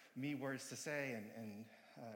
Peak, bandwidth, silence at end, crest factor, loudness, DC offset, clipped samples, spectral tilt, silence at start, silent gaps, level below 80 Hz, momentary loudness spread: -30 dBFS; 17 kHz; 0 s; 16 dB; -46 LUFS; under 0.1%; under 0.1%; -4.5 dB/octave; 0 s; none; under -90 dBFS; 13 LU